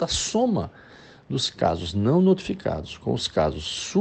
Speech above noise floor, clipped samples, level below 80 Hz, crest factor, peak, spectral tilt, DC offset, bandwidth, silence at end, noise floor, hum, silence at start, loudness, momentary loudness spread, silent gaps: 25 dB; under 0.1%; -46 dBFS; 16 dB; -8 dBFS; -5 dB/octave; under 0.1%; 8.8 kHz; 0 s; -49 dBFS; none; 0 s; -24 LUFS; 10 LU; none